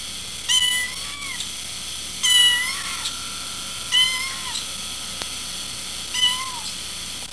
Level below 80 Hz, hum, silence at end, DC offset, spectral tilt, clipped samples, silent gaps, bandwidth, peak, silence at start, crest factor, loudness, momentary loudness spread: -50 dBFS; none; 0 s; 0.7%; 1 dB/octave; under 0.1%; none; 11 kHz; -6 dBFS; 0 s; 18 dB; -21 LUFS; 12 LU